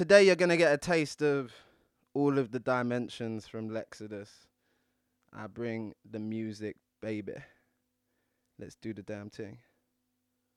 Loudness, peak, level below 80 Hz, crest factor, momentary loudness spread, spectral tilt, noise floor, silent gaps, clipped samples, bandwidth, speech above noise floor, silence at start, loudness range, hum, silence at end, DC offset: -30 LUFS; -10 dBFS; -70 dBFS; 22 dB; 20 LU; -5.5 dB/octave; -80 dBFS; none; under 0.1%; 12.5 kHz; 50 dB; 0 s; 14 LU; none; 1 s; under 0.1%